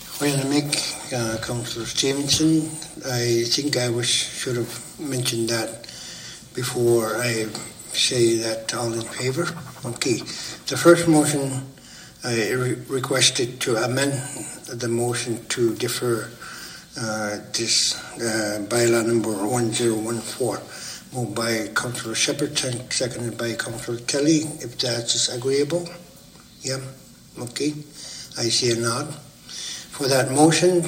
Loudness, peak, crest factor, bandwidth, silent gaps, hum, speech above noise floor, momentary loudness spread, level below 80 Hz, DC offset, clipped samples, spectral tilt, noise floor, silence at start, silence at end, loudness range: -22 LUFS; 0 dBFS; 22 dB; 16.5 kHz; none; none; 24 dB; 15 LU; -58 dBFS; under 0.1%; under 0.1%; -3.5 dB/octave; -47 dBFS; 0 s; 0 s; 4 LU